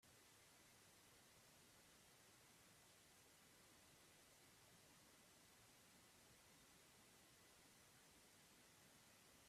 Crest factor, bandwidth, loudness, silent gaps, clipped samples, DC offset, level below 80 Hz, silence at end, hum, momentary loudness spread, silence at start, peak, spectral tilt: 14 dB; 15.5 kHz; -69 LUFS; none; under 0.1%; under 0.1%; -90 dBFS; 0 s; none; 0 LU; 0 s; -58 dBFS; -2 dB/octave